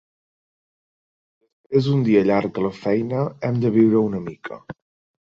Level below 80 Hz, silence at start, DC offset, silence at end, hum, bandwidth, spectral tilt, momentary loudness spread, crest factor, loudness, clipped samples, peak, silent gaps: -58 dBFS; 1.7 s; under 0.1%; 0.5 s; none; 7.2 kHz; -9 dB/octave; 16 LU; 18 dB; -20 LUFS; under 0.1%; -4 dBFS; none